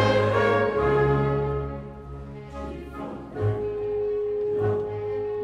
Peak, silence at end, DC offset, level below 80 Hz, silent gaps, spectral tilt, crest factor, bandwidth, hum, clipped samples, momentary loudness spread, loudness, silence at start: -10 dBFS; 0 s; under 0.1%; -42 dBFS; none; -7.5 dB/octave; 16 dB; 8.4 kHz; none; under 0.1%; 16 LU; -25 LUFS; 0 s